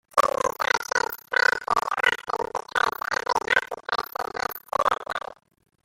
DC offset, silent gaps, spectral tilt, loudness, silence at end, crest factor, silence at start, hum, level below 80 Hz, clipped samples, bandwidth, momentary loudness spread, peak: under 0.1%; none; -1 dB/octave; -25 LUFS; 0.5 s; 22 dB; 0.15 s; none; -58 dBFS; under 0.1%; 17 kHz; 8 LU; -4 dBFS